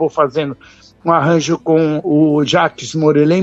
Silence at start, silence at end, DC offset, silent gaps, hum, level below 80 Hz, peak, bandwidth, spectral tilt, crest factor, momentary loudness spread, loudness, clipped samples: 0 s; 0 s; under 0.1%; none; none; -54 dBFS; 0 dBFS; 8 kHz; -6 dB/octave; 14 dB; 9 LU; -14 LUFS; under 0.1%